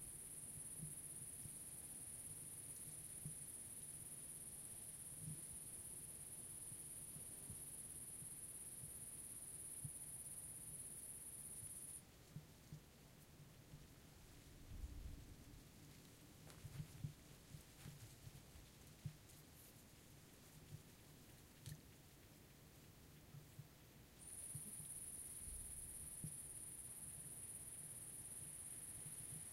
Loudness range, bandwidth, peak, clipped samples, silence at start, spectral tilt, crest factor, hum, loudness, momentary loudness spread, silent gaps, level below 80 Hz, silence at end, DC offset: 10 LU; 16 kHz; -36 dBFS; under 0.1%; 0 s; -3 dB/octave; 20 dB; none; -53 LUFS; 13 LU; none; -68 dBFS; 0 s; under 0.1%